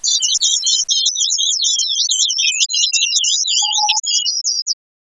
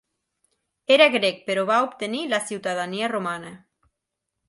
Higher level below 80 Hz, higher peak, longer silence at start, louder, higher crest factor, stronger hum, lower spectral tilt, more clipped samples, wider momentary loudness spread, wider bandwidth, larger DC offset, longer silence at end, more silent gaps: about the same, -72 dBFS vs -74 dBFS; about the same, 0 dBFS vs -2 dBFS; second, 0 s vs 0.9 s; first, -13 LUFS vs -22 LUFS; second, 16 dB vs 22 dB; neither; second, 8 dB/octave vs -3.5 dB/octave; neither; second, 3 LU vs 15 LU; about the same, 11 kHz vs 11.5 kHz; neither; second, 0.3 s vs 0.9 s; first, 4.62-4.66 s vs none